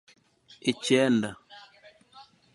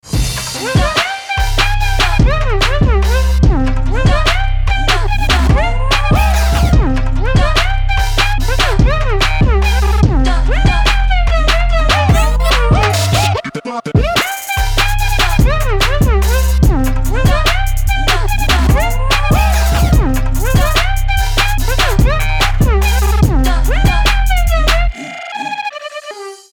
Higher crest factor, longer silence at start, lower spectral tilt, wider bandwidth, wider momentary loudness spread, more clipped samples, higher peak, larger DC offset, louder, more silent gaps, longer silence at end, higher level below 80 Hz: first, 22 dB vs 12 dB; first, 0.65 s vs 0.05 s; about the same, -4.5 dB/octave vs -4.5 dB/octave; second, 11.5 kHz vs over 20 kHz; first, 23 LU vs 5 LU; neither; second, -8 dBFS vs 0 dBFS; neither; second, -26 LUFS vs -13 LUFS; neither; first, 0.3 s vs 0.15 s; second, -70 dBFS vs -14 dBFS